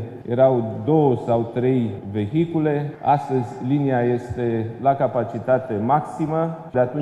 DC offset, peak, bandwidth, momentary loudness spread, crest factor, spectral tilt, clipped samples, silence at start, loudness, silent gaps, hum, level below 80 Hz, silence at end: under 0.1%; -4 dBFS; 10.5 kHz; 6 LU; 16 dB; -9.5 dB/octave; under 0.1%; 0 s; -21 LUFS; none; none; -56 dBFS; 0 s